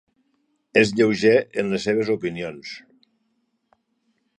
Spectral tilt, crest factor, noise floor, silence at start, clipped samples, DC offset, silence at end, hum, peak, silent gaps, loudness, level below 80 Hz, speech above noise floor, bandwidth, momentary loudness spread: -5.5 dB/octave; 22 dB; -71 dBFS; 0.75 s; under 0.1%; under 0.1%; 1.6 s; none; 0 dBFS; none; -21 LUFS; -60 dBFS; 50 dB; 10.5 kHz; 18 LU